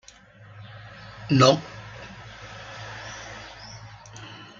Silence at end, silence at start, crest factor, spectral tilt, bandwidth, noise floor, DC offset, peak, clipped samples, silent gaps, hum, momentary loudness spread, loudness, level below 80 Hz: 0.3 s; 0.6 s; 26 dB; -5 dB/octave; 7.6 kHz; -50 dBFS; under 0.1%; -4 dBFS; under 0.1%; none; none; 25 LU; -23 LUFS; -56 dBFS